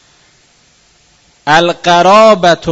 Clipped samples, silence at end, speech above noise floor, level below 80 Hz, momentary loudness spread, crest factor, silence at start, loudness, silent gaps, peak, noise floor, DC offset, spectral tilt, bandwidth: 1%; 0 s; 42 dB; -46 dBFS; 6 LU; 10 dB; 1.45 s; -7 LUFS; none; 0 dBFS; -49 dBFS; under 0.1%; -4 dB/octave; 11 kHz